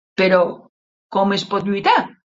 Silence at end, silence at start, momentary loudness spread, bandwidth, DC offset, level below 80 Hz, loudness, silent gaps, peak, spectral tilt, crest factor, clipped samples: 0.25 s; 0.2 s; 7 LU; 7.8 kHz; under 0.1%; -62 dBFS; -18 LUFS; 0.69-1.10 s; -2 dBFS; -5.5 dB/octave; 18 dB; under 0.1%